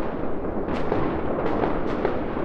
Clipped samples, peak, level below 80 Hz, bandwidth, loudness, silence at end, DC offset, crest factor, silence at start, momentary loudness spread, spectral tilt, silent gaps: under 0.1%; -8 dBFS; -36 dBFS; 6.2 kHz; -26 LUFS; 0 s; under 0.1%; 16 dB; 0 s; 4 LU; -8.5 dB/octave; none